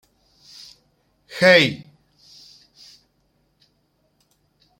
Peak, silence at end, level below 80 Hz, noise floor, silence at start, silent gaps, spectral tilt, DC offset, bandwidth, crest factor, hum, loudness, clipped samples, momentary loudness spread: -2 dBFS; 3.05 s; -66 dBFS; -66 dBFS; 1.35 s; none; -4.5 dB/octave; under 0.1%; 16.5 kHz; 24 dB; none; -15 LUFS; under 0.1%; 29 LU